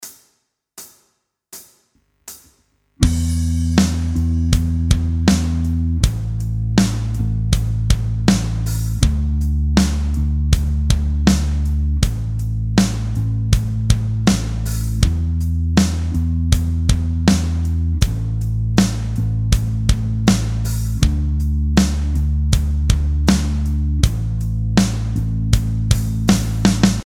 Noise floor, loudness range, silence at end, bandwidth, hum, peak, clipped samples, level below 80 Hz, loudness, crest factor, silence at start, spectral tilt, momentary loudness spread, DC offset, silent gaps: -66 dBFS; 1 LU; 0 s; 16 kHz; none; 0 dBFS; under 0.1%; -22 dBFS; -19 LUFS; 18 dB; 0 s; -5.5 dB/octave; 5 LU; under 0.1%; none